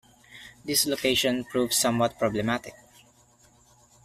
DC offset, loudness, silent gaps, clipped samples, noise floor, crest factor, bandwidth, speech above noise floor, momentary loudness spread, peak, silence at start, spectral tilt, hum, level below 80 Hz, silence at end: under 0.1%; -25 LUFS; none; under 0.1%; -59 dBFS; 18 dB; 15.5 kHz; 34 dB; 20 LU; -10 dBFS; 0.35 s; -3 dB/octave; none; -58 dBFS; 1.3 s